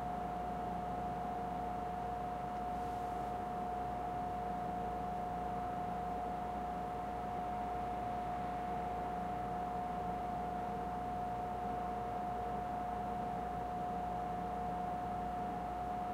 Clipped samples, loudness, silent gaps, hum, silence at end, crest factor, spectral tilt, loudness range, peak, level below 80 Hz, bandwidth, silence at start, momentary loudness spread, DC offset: under 0.1%; -40 LUFS; none; none; 0 s; 12 dB; -7 dB/octave; 0 LU; -28 dBFS; -54 dBFS; 16 kHz; 0 s; 1 LU; under 0.1%